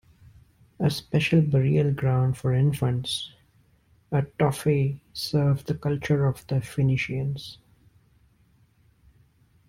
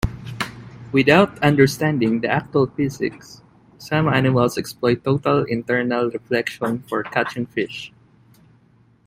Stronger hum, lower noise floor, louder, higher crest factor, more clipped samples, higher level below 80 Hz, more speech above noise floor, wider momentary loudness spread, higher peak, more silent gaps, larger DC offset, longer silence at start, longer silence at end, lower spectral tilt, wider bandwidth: neither; first, -62 dBFS vs -55 dBFS; second, -25 LUFS vs -20 LUFS; about the same, 18 dB vs 20 dB; neither; second, -52 dBFS vs -44 dBFS; about the same, 38 dB vs 36 dB; second, 8 LU vs 13 LU; second, -8 dBFS vs 0 dBFS; neither; neither; first, 0.8 s vs 0.05 s; first, 2.15 s vs 1.2 s; about the same, -7 dB/octave vs -6.5 dB/octave; about the same, 15.5 kHz vs 16 kHz